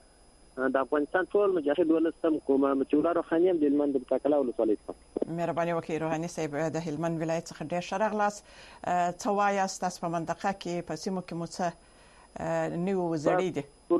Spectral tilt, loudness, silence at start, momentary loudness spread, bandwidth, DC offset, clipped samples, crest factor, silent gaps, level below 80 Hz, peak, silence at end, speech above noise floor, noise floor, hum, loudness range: -6 dB/octave; -29 LUFS; 0.55 s; 9 LU; 12.5 kHz; under 0.1%; under 0.1%; 16 dB; none; -62 dBFS; -12 dBFS; 0 s; 29 dB; -58 dBFS; none; 5 LU